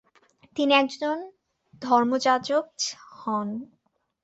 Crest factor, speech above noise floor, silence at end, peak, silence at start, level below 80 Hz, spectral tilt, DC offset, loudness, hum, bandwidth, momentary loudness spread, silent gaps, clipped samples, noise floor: 18 dB; 36 dB; 0.6 s; -8 dBFS; 0.55 s; -72 dBFS; -3 dB/octave; under 0.1%; -25 LUFS; none; 8.2 kHz; 16 LU; none; under 0.1%; -60 dBFS